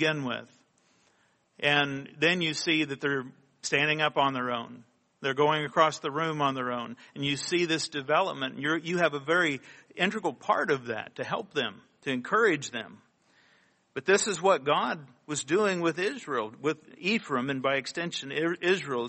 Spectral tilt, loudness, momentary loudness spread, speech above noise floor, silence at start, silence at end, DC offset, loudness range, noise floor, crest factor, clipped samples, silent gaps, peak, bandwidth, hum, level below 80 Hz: -4 dB/octave; -28 LUFS; 10 LU; 40 dB; 0 s; 0 s; under 0.1%; 2 LU; -68 dBFS; 22 dB; under 0.1%; none; -8 dBFS; 8.4 kHz; none; -74 dBFS